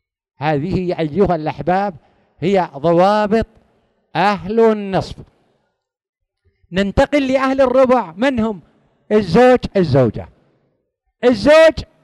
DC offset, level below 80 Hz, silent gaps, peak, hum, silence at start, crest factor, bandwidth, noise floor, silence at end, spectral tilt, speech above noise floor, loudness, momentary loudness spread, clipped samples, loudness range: under 0.1%; -40 dBFS; 6.09-6.13 s; 0 dBFS; none; 0.4 s; 16 dB; 12 kHz; -70 dBFS; 0.2 s; -7 dB/octave; 56 dB; -15 LUFS; 12 LU; under 0.1%; 5 LU